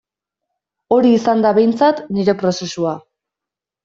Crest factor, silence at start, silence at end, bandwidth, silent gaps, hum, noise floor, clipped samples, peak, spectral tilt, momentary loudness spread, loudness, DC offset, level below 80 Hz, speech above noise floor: 14 dB; 0.9 s; 0.85 s; 7.6 kHz; none; none; -86 dBFS; under 0.1%; -2 dBFS; -6 dB/octave; 9 LU; -15 LUFS; under 0.1%; -60 dBFS; 72 dB